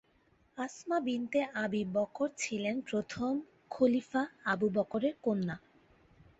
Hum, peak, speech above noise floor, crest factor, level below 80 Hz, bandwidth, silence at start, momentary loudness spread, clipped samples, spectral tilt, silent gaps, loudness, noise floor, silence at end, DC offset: none; -16 dBFS; 36 dB; 18 dB; -70 dBFS; 8.2 kHz; 0.55 s; 10 LU; under 0.1%; -5.5 dB/octave; none; -34 LUFS; -69 dBFS; 0.8 s; under 0.1%